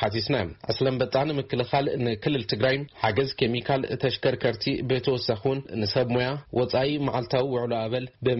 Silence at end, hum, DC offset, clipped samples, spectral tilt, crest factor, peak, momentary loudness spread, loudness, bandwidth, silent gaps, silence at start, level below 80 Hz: 0 s; none; under 0.1%; under 0.1%; -4.5 dB/octave; 18 dB; -8 dBFS; 3 LU; -26 LUFS; 6 kHz; none; 0 s; -54 dBFS